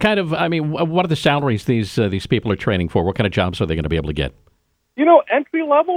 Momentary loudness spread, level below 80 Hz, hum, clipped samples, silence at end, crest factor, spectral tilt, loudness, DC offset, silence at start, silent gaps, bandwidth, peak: 8 LU; -38 dBFS; none; under 0.1%; 0 s; 18 dB; -7 dB/octave; -18 LUFS; under 0.1%; 0 s; none; 15 kHz; 0 dBFS